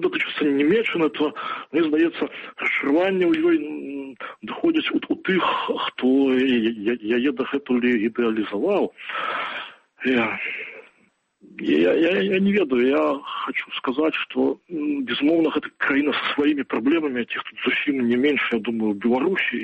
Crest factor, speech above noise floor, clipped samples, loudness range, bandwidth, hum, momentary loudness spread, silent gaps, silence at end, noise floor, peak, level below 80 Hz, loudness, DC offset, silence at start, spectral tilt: 14 dB; 41 dB; under 0.1%; 2 LU; 7.6 kHz; none; 9 LU; none; 0 s; -63 dBFS; -8 dBFS; -64 dBFS; -22 LUFS; under 0.1%; 0 s; -7 dB/octave